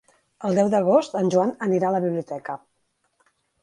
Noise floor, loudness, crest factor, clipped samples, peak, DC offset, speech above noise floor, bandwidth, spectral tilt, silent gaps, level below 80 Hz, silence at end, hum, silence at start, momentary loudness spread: -71 dBFS; -22 LUFS; 18 dB; under 0.1%; -6 dBFS; under 0.1%; 50 dB; 11 kHz; -7 dB/octave; none; -70 dBFS; 1.05 s; none; 0.4 s; 13 LU